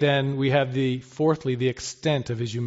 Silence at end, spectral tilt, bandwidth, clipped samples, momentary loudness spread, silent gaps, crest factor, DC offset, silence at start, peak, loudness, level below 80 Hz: 0 s; -5.5 dB/octave; 8 kHz; under 0.1%; 5 LU; none; 16 dB; under 0.1%; 0 s; -8 dBFS; -25 LUFS; -58 dBFS